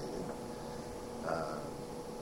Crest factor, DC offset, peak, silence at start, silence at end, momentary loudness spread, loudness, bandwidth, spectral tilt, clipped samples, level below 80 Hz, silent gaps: 18 dB; under 0.1%; -24 dBFS; 0 s; 0 s; 6 LU; -42 LUFS; 16 kHz; -5.5 dB/octave; under 0.1%; -58 dBFS; none